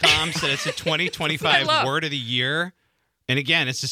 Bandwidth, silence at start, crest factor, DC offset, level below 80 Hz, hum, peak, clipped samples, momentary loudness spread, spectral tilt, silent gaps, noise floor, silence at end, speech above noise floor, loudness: 18 kHz; 0 s; 20 dB; under 0.1%; -54 dBFS; none; -2 dBFS; under 0.1%; 7 LU; -3 dB/octave; none; -61 dBFS; 0 s; 38 dB; -21 LUFS